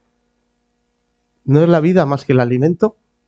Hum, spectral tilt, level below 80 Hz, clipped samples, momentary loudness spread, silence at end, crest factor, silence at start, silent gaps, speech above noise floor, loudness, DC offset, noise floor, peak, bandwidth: none; -9 dB/octave; -54 dBFS; under 0.1%; 7 LU; 0.4 s; 16 dB; 1.45 s; none; 54 dB; -14 LUFS; under 0.1%; -67 dBFS; 0 dBFS; 7.4 kHz